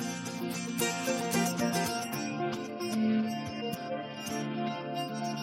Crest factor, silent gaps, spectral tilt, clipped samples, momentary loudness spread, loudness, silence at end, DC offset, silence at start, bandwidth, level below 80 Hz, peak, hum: 20 dB; none; -4 dB/octave; under 0.1%; 7 LU; -33 LUFS; 0 s; under 0.1%; 0 s; 16.5 kHz; -72 dBFS; -14 dBFS; none